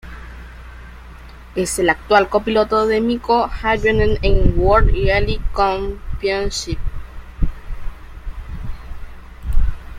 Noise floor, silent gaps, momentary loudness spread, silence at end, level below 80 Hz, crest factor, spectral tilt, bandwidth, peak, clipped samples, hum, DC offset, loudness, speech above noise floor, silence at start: -37 dBFS; none; 23 LU; 0 s; -24 dBFS; 16 dB; -5 dB/octave; 15 kHz; 0 dBFS; under 0.1%; none; under 0.1%; -18 LUFS; 22 dB; 0.05 s